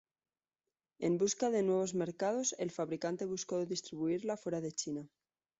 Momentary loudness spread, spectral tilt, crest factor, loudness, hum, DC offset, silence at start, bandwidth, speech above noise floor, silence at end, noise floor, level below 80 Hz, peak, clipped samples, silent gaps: 7 LU; -5.5 dB/octave; 16 dB; -36 LUFS; none; under 0.1%; 1 s; 8 kHz; over 54 dB; 0.55 s; under -90 dBFS; -76 dBFS; -22 dBFS; under 0.1%; none